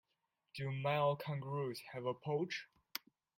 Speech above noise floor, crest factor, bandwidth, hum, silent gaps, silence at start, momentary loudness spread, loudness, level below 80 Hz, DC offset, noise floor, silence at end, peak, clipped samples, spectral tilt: 47 dB; 22 dB; 16 kHz; none; none; 0.55 s; 13 LU; -41 LUFS; -80 dBFS; under 0.1%; -86 dBFS; 0.4 s; -18 dBFS; under 0.1%; -6 dB/octave